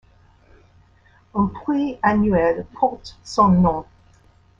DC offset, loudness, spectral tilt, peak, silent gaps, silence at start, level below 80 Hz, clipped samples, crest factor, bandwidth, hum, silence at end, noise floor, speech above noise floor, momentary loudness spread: under 0.1%; -20 LUFS; -7.5 dB/octave; -4 dBFS; none; 1.35 s; -44 dBFS; under 0.1%; 18 dB; 7.8 kHz; none; 0.75 s; -54 dBFS; 35 dB; 11 LU